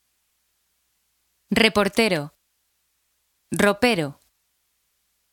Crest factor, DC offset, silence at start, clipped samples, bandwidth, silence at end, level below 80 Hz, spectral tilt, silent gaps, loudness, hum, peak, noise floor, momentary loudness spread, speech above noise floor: 26 dB; under 0.1%; 1.5 s; under 0.1%; 18 kHz; 1.2 s; -54 dBFS; -4 dB/octave; none; -21 LUFS; none; 0 dBFS; -71 dBFS; 14 LU; 51 dB